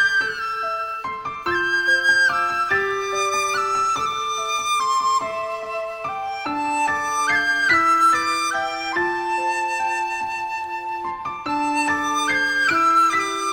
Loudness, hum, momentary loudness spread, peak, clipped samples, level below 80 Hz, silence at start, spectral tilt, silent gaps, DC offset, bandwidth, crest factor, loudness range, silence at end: -20 LUFS; none; 11 LU; -6 dBFS; under 0.1%; -58 dBFS; 0 s; -1.5 dB/octave; none; under 0.1%; 16 kHz; 14 dB; 4 LU; 0 s